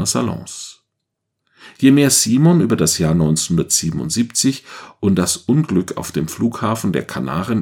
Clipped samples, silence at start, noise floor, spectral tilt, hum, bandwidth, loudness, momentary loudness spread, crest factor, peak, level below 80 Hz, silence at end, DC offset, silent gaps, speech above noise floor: under 0.1%; 0 s; -77 dBFS; -4.5 dB/octave; none; 17 kHz; -16 LUFS; 11 LU; 16 dB; 0 dBFS; -46 dBFS; 0 s; under 0.1%; none; 60 dB